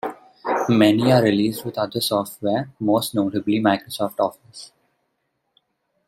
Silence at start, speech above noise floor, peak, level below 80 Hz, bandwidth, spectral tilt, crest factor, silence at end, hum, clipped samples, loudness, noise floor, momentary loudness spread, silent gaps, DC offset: 0.05 s; 53 dB; -2 dBFS; -62 dBFS; 16 kHz; -5.5 dB/octave; 20 dB; 1.4 s; none; under 0.1%; -20 LUFS; -73 dBFS; 13 LU; none; under 0.1%